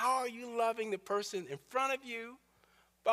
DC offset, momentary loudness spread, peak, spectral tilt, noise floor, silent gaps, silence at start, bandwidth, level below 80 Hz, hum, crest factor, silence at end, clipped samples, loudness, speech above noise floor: under 0.1%; 9 LU; -18 dBFS; -3 dB/octave; -69 dBFS; none; 0 s; 15.5 kHz; -82 dBFS; none; 18 dB; 0 s; under 0.1%; -37 LUFS; 32 dB